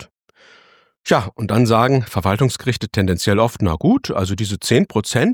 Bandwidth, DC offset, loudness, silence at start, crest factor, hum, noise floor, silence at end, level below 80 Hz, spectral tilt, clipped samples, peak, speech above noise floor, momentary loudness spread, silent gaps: 18.5 kHz; under 0.1%; -18 LUFS; 0 s; 16 dB; none; -52 dBFS; 0 s; -42 dBFS; -5.5 dB/octave; under 0.1%; -2 dBFS; 36 dB; 6 LU; none